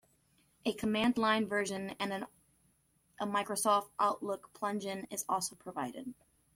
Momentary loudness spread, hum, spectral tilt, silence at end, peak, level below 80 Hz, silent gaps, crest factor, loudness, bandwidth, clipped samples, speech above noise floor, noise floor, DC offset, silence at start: 11 LU; none; -3.5 dB/octave; 0.4 s; -16 dBFS; -72 dBFS; none; 18 dB; -35 LUFS; 16.5 kHz; under 0.1%; 38 dB; -73 dBFS; under 0.1%; 0.65 s